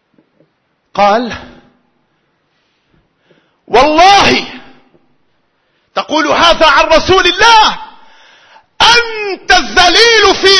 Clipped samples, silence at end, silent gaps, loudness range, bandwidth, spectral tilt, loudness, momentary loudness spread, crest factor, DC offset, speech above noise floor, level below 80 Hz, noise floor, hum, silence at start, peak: 0.6%; 0 s; none; 10 LU; 11 kHz; -2 dB/octave; -7 LUFS; 16 LU; 10 dB; under 0.1%; 52 dB; -34 dBFS; -60 dBFS; none; 0.95 s; 0 dBFS